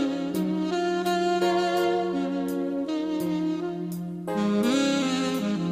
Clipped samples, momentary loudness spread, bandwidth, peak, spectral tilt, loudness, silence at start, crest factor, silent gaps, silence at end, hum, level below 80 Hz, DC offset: under 0.1%; 7 LU; 15.5 kHz; -12 dBFS; -5.5 dB/octave; -26 LUFS; 0 s; 14 dB; none; 0 s; none; -64 dBFS; under 0.1%